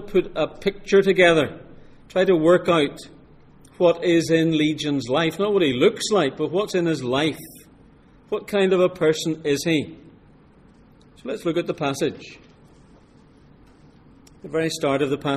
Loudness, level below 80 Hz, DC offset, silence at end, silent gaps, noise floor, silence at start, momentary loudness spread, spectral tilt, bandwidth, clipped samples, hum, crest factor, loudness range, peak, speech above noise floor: -21 LUFS; -52 dBFS; under 0.1%; 0 s; none; -51 dBFS; 0 s; 11 LU; -5 dB/octave; 15 kHz; under 0.1%; none; 20 dB; 10 LU; -2 dBFS; 31 dB